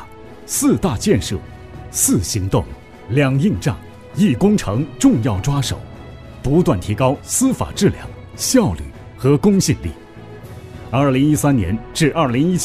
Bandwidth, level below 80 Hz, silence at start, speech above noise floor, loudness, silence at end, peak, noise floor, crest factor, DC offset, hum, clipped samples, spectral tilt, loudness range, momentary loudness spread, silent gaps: 15.5 kHz; -36 dBFS; 0 s; 20 dB; -17 LUFS; 0 s; -2 dBFS; -36 dBFS; 16 dB; 0.2%; none; under 0.1%; -5.5 dB/octave; 1 LU; 20 LU; none